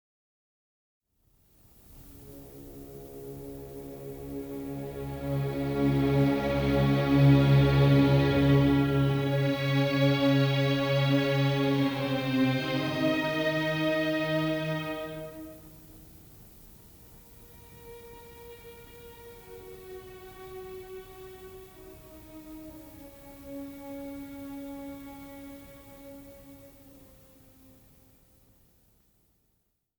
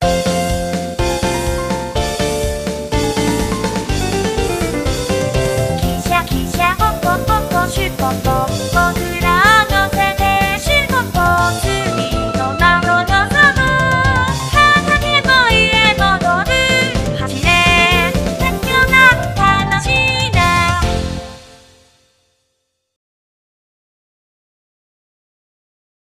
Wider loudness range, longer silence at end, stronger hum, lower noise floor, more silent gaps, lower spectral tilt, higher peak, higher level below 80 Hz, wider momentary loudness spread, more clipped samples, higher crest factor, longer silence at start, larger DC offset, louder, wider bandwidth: first, 24 LU vs 6 LU; second, 3.3 s vs 4.7 s; neither; first, -75 dBFS vs -69 dBFS; neither; first, -7.5 dB/octave vs -4 dB/octave; second, -12 dBFS vs 0 dBFS; second, -48 dBFS vs -26 dBFS; first, 25 LU vs 9 LU; neither; about the same, 18 dB vs 14 dB; first, 1.9 s vs 0 s; neither; second, -26 LUFS vs -14 LUFS; first, over 20 kHz vs 15.5 kHz